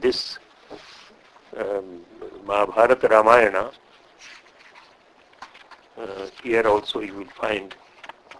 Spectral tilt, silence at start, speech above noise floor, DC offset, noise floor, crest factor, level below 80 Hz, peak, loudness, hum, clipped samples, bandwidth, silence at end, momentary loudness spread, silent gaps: -4 dB/octave; 0 s; 33 dB; under 0.1%; -54 dBFS; 24 dB; -58 dBFS; 0 dBFS; -21 LUFS; none; under 0.1%; 11 kHz; 0.35 s; 27 LU; none